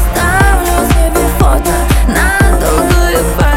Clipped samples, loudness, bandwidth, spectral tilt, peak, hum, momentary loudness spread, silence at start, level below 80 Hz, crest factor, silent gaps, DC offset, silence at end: under 0.1%; -10 LUFS; 16.5 kHz; -5 dB/octave; 0 dBFS; none; 2 LU; 0 s; -12 dBFS; 8 dB; none; under 0.1%; 0 s